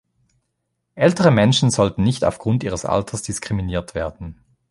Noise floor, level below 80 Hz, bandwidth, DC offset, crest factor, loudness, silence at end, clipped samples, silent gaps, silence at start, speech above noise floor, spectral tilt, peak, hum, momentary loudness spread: -74 dBFS; -42 dBFS; 11.5 kHz; under 0.1%; 18 dB; -19 LUFS; 0.4 s; under 0.1%; none; 0.95 s; 56 dB; -5.5 dB/octave; -2 dBFS; none; 13 LU